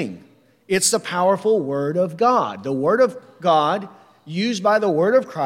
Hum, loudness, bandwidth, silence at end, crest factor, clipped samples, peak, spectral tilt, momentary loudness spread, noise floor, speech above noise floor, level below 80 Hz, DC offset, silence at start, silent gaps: none; -19 LUFS; 16.5 kHz; 0 s; 14 dB; under 0.1%; -6 dBFS; -4 dB/octave; 7 LU; -52 dBFS; 33 dB; -68 dBFS; under 0.1%; 0 s; none